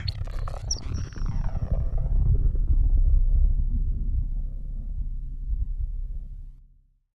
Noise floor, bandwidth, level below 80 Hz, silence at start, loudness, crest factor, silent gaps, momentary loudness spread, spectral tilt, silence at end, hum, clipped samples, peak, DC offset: -57 dBFS; 6.4 kHz; -24 dBFS; 0 s; -30 LUFS; 14 dB; none; 13 LU; -5.5 dB/octave; 0.6 s; none; under 0.1%; -10 dBFS; under 0.1%